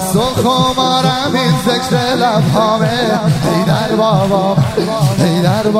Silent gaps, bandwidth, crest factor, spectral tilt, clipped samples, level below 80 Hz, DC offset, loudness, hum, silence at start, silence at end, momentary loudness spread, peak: none; 16 kHz; 12 dB; -5.5 dB/octave; under 0.1%; -40 dBFS; under 0.1%; -13 LUFS; none; 0 s; 0 s; 2 LU; 0 dBFS